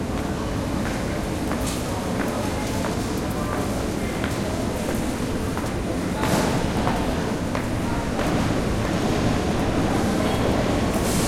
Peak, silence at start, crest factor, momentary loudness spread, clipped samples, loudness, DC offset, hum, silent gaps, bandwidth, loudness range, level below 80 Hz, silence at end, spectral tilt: -4 dBFS; 0 s; 18 dB; 4 LU; under 0.1%; -24 LUFS; under 0.1%; none; none; 16.5 kHz; 3 LU; -34 dBFS; 0 s; -5.5 dB/octave